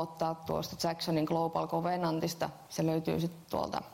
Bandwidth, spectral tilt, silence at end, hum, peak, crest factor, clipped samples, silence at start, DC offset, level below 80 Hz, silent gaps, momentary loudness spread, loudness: 16 kHz; -5.5 dB/octave; 0 s; none; -18 dBFS; 14 dB; under 0.1%; 0 s; under 0.1%; -64 dBFS; none; 5 LU; -34 LUFS